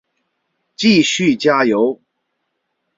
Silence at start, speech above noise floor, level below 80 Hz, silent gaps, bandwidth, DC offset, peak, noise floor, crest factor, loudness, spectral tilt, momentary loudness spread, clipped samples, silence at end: 0.8 s; 58 dB; -60 dBFS; none; 7.8 kHz; under 0.1%; -2 dBFS; -72 dBFS; 16 dB; -14 LUFS; -4.5 dB/octave; 6 LU; under 0.1%; 1.05 s